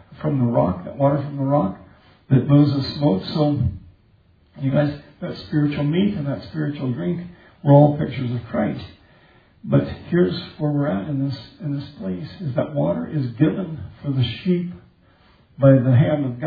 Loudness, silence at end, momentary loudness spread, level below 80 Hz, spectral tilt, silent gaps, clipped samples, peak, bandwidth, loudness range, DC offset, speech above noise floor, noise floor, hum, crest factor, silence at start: -21 LUFS; 0 s; 14 LU; -50 dBFS; -10.5 dB/octave; none; under 0.1%; 0 dBFS; 5 kHz; 4 LU; under 0.1%; 36 dB; -56 dBFS; none; 20 dB; 0.1 s